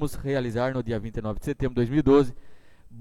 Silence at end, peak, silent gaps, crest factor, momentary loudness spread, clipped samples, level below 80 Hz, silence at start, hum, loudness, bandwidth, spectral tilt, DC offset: 0 s; -10 dBFS; none; 16 dB; 11 LU; under 0.1%; -40 dBFS; 0 s; none; -25 LUFS; 14.5 kHz; -7.5 dB/octave; under 0.1%